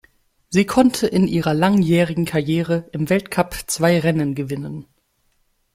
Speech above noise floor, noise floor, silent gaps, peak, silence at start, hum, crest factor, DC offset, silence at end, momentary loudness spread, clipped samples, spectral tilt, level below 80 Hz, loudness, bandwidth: 46 dB; -65 dBFS; none; -2 dBFS; 0.5 s; none; 16 dB; under 0.1%; 0.95 s; 9 LU; under 0.1%; -6 dB/octave; -48 dBFS; -19 LUFS; 16 kHz